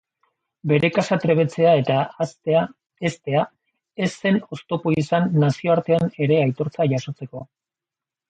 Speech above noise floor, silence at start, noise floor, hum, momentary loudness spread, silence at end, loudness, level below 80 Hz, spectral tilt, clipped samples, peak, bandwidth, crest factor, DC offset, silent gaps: 68 dB; 0.65 s; -89 dBFS; none; 13 LU; 0.85 s; -21 LUFS; -62 dBFS; -7 dB/octave; under 0.1%; -4 dBFS; 9 kHz; 18 dB; under 0.1%; 2.86-2.90 s